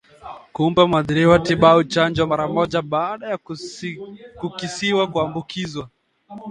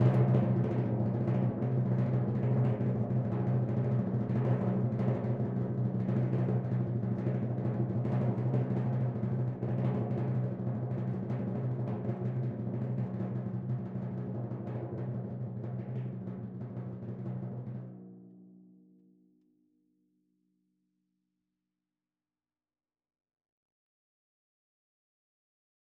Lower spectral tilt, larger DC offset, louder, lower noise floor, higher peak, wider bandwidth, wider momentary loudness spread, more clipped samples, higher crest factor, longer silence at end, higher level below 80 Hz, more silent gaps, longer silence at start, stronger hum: second, -6 dB/octave vs -11.5 dB/octave; neither; first, -19 LUFS vs -33 LUFS; second, -40 dBFS vs under -90 dBFS; first, 0 dBFS vs -14 dBFS; first, 10 kHz vs 3.4 kHz; first, 19 LU vs 9 LU; neither; about the same, 20 dB vs 20 dB; second, 0 s vs 7.35 s; first, -48 dBFS vs -62 dBFS; neither; first, 0.25 s vs 0 s; neither